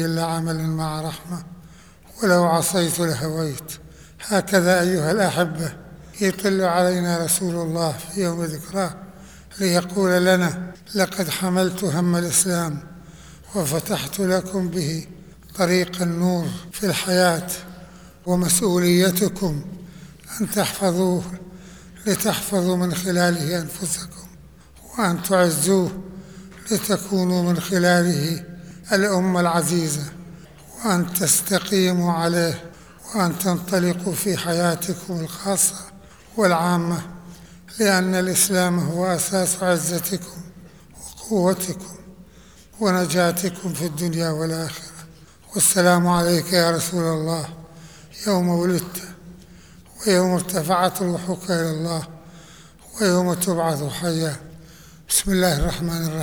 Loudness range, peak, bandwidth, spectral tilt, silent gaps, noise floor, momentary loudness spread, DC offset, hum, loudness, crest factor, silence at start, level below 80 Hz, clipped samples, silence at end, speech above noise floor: 4 LU; -4 dBFS; over 20 kHz; -4.5 dB/octave; none; -48 dBFS; 18 LU; 0.2%; none; -21 LUFS; 18 dB; 0 s; -46 dBFS; under 0.1%; 0 s; 27 dB